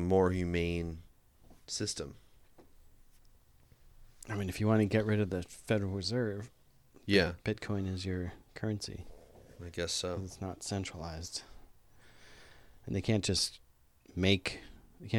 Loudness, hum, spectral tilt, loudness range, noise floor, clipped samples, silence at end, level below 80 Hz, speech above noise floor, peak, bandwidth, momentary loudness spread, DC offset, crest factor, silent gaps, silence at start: -34 LUFS; none; -5 dB/octave; 8 LU; -62 dBFS; under 0.1%; 0 s; -56 dBFS; 29 dB; -14 dBFS; 15 kHz; 17 LU; under 0.1%; 22 dB; none; 0 s